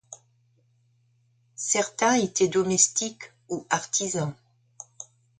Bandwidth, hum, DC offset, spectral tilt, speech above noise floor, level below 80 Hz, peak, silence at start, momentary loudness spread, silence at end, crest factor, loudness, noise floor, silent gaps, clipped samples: 9.6 kHz; none; under 0.1%; -3 dB/octave; 41 dB; -68 dBFS; -6 dBFS; 0.1 s; 25 LU; 0.35 s; 22 dB; -24 LUFS; -66 dBFS; none; under 0.1%